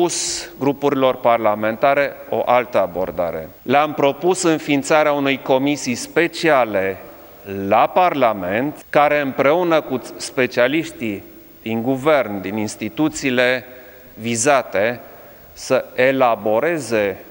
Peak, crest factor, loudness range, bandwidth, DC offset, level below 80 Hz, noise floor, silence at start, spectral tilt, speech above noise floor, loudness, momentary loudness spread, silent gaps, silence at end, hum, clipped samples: 0 dBFS; 18 dB; 3 LU; 17 kHz; under 0.1%; -54 dBFS; -41 dBFS; 0 s; -4 dB/octave; 23 dB; -18 LUFS; 10 LU; none; 0 s; none; under 0.1%